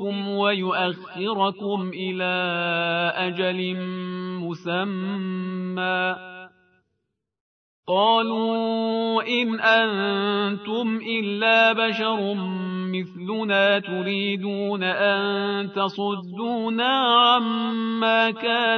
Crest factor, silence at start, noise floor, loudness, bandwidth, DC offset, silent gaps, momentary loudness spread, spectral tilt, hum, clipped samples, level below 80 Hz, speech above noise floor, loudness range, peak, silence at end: 18 dB; 0 s; -78 dBFS; -23 LUFS; 6.4 kHz; under 0.1%; 7.40-7.83 s; 11 LU; -6.5 dB/octave; none; under 0.1%; -78 dBFS; 55 dB; 6 LU; -4 dBFS; 0 s